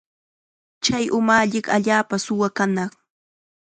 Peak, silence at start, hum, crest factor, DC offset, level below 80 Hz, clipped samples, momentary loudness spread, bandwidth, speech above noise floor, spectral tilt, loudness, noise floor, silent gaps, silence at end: -2 dBFS; 0.8 s; none; 20 dB; under 0.1%; -60 dBFS; under 0.1%; 7 LU; 9.4 kHz; over 70 dB; -4 dB/octave; -20 LUFS; under -90 dBFS; none; 0.9 s